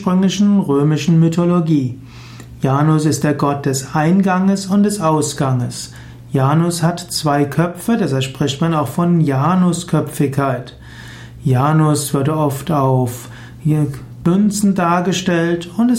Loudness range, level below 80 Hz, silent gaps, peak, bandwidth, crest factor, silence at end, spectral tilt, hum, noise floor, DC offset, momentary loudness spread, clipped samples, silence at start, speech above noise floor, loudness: 2 LU; -46 dBFS; none; -4 dBFS; 16.5 kHz; 12 dB; 0 s; -6 dB/octave; none; -35 dBFS; under 0.1%; 11 LU; under 0.1%; 0 s; 20 dB; -16 LUFS